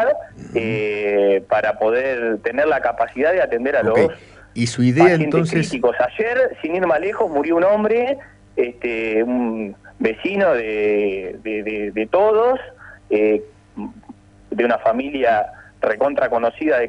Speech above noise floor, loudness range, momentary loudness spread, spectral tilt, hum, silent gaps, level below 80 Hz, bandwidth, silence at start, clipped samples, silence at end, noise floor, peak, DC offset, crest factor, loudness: 25 dB; 3 LU; 10 LU; -6.5 dB/octave; none; none; -52 dBFS; 11 kHz; 0 s; under 0.1%; 0 s; -43 dBFS; -2 dBFS; under 0.1%; 18 dB; -19 LUFS